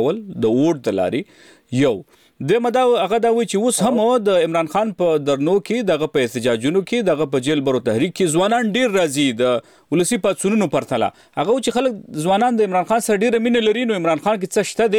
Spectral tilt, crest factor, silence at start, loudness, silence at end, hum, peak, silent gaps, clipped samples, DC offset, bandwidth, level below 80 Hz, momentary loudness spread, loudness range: -5 dB/octave; 12 dB; 0 s; -18 LUFS; 0 s; none; -6 dBFS; none; under 0.1%; under 0.1%; 17 kHz; -58 dBFS; 5 LU; 2 LU